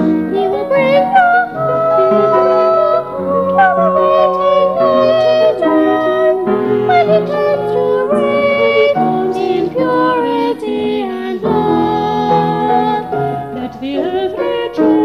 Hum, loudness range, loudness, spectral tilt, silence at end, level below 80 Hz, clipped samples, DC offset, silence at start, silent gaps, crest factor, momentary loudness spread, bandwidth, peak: none; 4 LU; -13 LUFS; -7.5 dB/octave; 0 s; -50 dBFS; under 0.1%; 0.2%; 0 s; none; 12 dB; 7 LU; 12.5 kHz; 0 dBFS